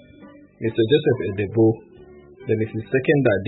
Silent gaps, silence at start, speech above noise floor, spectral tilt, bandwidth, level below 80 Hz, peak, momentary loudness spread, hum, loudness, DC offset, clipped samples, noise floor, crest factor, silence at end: none; 0.2 s; 26 dB; -12 dB/octave; 4.1 kHz; -56 dBFS; -6 dBFS; 10 LU; none; -21 LUFS; under 0.1%; under 0.1%; -46 dBFS; 16 dB; 0 s